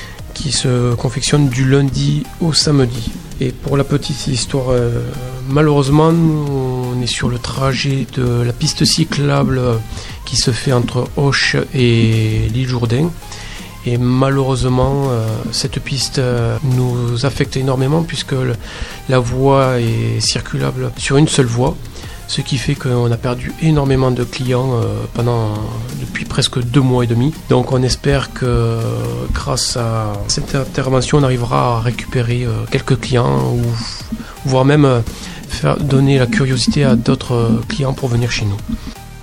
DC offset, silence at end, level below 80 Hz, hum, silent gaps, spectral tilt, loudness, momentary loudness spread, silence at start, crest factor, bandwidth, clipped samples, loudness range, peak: 0.2%; 0 s; -30 dBFS; none; none; -5.5 dB/octave; -15 LUFS; 9 LU; 0 s; 14 dB; 16 kHz; under 0.1%; 2 LU; 0 dBFS